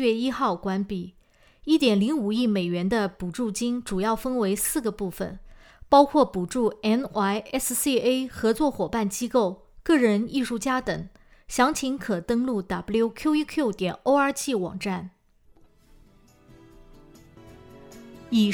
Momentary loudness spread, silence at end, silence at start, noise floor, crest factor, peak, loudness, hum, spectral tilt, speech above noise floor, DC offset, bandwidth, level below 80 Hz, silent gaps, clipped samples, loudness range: 11 LU; 0 s; 0 s; -57 dBFS; 20 dB; -4 dBFS; -25 LUFS; none; -4.5 dB/octave; 33 dB; under 0.1%; over 20 kHz; -52 dBFS; none; under 0.1%; 5 LU